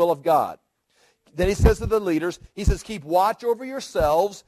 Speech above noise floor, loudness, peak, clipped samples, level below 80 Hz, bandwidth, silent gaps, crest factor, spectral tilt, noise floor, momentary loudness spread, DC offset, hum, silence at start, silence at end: 42 dB; -23 LUFS; -2 dBFS; under 0.1%; -30 dBFS; 14 kHz; none; 20 dB; -6 dB/octave; -63 dBFS; 9 LU; under 0.1%; none; 0 s; 0.1 s